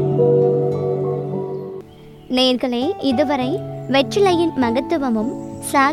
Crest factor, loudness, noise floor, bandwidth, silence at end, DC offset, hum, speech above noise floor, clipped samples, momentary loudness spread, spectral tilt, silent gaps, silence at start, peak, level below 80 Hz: 16 dB; -19 LUFS; -40 dBFS; 15 kHz; 0 s; under 0.1%; none; 23 dB; under 0.1%; 10 LU; -5.5 dB/octave; none; 0 s; -2 dBFS; -52 dBFS